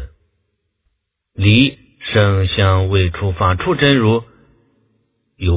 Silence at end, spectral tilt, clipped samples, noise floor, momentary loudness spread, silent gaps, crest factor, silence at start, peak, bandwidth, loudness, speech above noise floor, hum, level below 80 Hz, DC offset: 0 s; -10.5 dB/octave; under 0.1%; -69 dBFS; 7 LU; none; 16 dB; 0 s; 0 dBFS; 4 kHz; -15 LUFS; 55 dB; none; -28 dBFS; under 0.1%